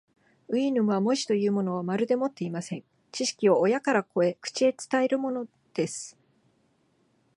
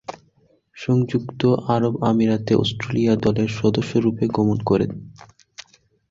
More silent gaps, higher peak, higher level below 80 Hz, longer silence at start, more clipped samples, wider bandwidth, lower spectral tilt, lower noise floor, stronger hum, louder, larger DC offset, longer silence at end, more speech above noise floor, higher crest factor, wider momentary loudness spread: neither; second, -10 dBFS vs -4 dBFS; second, -78 dBFS vs -50 dBFS; first, 0.5 s vs 0.1 s; neither; first, 11.5 kHz vs 7.6 kHz; second, -5 dB/octave vs -7.5 dB/octave; first, -68 dBFS vs -60 dBFS; neither; second, -27 LUFS vs -20 LUFS; neither; first, 1.25 s vs 0.5 s; about the same, 42 dB vs 40 dB; about the same, 18 dB vs 16 dB; first, 12 LU vs 5 LU